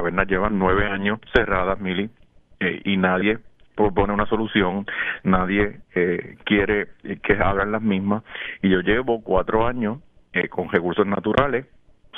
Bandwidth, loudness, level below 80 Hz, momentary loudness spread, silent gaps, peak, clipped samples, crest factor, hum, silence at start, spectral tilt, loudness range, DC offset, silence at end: 5.2 kHz; -22 LUFS; -38 dBFS; 8 LU; none; -2 dBFS; under 0.1%; 20 dB; none; 0 s; -8.5 dB/octave; 1 LU; under 0.1%; 0 s